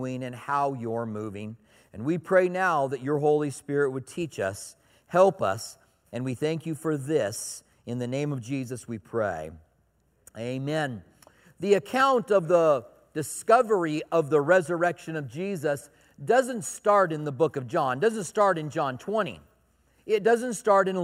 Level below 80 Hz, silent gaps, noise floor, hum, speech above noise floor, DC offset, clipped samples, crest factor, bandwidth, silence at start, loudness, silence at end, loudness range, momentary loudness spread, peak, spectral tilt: -68 dBFS; none; -67 dBFS; none; 42 dB; under 0.1%; under 0.1%; 20 dB; 16 kHz; 0 s; -26 LUFS; 0 s; 7 LU; 13 LU; -6 dBFS; -5.5 dB/octave